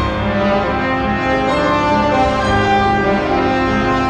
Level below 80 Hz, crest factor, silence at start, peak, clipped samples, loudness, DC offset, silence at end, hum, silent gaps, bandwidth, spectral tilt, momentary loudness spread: -30 dBFS; 12 dB; 0 s; -2 dBFS; under 0.1%; -15 LUFS; under 0.1%; 0 s; none; none; 9.8 kHz; -6 dB/octave; 3 LU